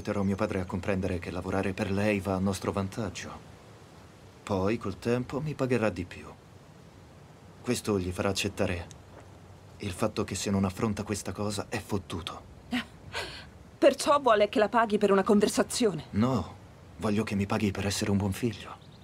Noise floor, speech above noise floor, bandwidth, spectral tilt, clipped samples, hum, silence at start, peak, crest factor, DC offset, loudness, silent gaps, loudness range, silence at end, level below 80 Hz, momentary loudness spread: -52 dBFS; 23 dB; 16 kHz; -5.5 dB/octave; under 0.1%; none; 0 s; -10 dBFS; 20 dB; under 0.1%; -29 LUFS; none; 8 LU; 0.05 s; -58 dBFS; 16 LU